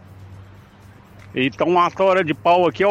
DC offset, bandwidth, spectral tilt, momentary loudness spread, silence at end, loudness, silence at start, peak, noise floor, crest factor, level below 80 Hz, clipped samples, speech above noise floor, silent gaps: under 0.1%; 9.4 kHz; -6.5 dB/octave; 7 LU; 0 s; -18 LUFS; 0.2 s; -6 dBFS; -45 dBFS; 14 dB; -56 dBFS; under 0.1%; 28 dB; none